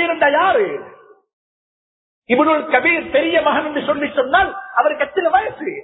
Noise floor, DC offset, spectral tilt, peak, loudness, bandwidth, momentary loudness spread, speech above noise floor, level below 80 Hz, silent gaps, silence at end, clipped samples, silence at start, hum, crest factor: under -90 dBFS; under 0.1%; -9 dB/octave; -2 dBFS; -16 LUFS; 4 kHz; 5 LU; over 74 dB; -52 dBFS; 1.33-2.22 s; 0 s; under 0.1%; 0 s; none; 16 dB